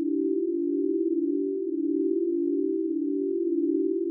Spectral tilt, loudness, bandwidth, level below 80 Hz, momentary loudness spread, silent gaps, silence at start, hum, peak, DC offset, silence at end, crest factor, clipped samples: -9 dB/octave; -27 LUFS; 0.5 kHz; under -90 dBFS; 2 LU; none; 0 s; none; -16 dBFS; under 0.1%; 0 s; 10 dB; under 0.1%